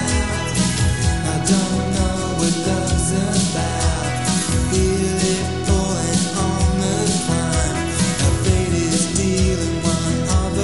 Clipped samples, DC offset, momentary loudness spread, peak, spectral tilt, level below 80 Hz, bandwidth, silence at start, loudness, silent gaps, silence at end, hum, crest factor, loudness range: under 0.1%; 1%; 2 LU; -4 dBFS; -4.5 dB/octave; -26 dBFS; 12 kHz; 0 s; -19 LUFS; none; 0 s; none; 16 dB; 1 LU